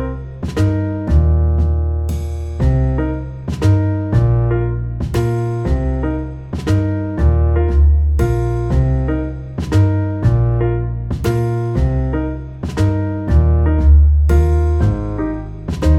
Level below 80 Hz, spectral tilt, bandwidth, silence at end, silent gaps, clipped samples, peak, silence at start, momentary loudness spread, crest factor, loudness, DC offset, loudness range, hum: -20 dBFS; -8.5 dB/octave; 8.6 kHz; 0 s; none; under 0.1%; -2 dBFS; 0 s; 10 LU; 12 dB; -17 LUFS; under 0.1%; 3 LU; none